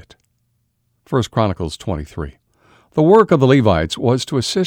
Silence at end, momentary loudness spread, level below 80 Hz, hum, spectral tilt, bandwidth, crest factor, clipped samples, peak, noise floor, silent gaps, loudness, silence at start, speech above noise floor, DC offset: 0 s; 14 LU; -40 dBFS; none; -6.5 dB/octave; 16 kHz; 16 dB; under 0.1%; 0 dBFS; -66 dBFS; none; -16 LUFS; 1.1 s; 51 dB; under 0.1%